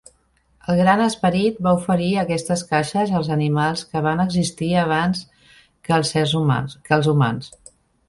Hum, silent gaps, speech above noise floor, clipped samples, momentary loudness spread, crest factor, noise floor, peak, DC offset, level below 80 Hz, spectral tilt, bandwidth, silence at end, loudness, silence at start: none; none; 42 dB; under 0.1%; 6 LU; 18 dB; -61 dBFS; -2 dBFS; under 0.1%; -50 dBFS; -6 dB/octave; 11.5 kHz; 0.6 s; -20 LUFS; 0.7 s